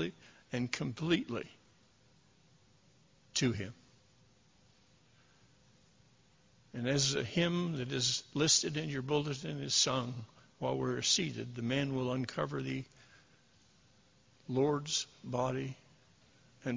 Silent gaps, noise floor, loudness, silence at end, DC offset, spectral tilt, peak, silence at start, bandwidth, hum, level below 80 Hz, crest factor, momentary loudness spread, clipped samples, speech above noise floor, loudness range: none; -67 dBFS; -34 LUFS; 0 s; under 0.1%; -3.5 dB/octave; -14 dBFS; 0 s; 7.8 kHz; none; -66 dBFS; 24 dB; 14 LU; under 0.1%; 33 dB; 10 LU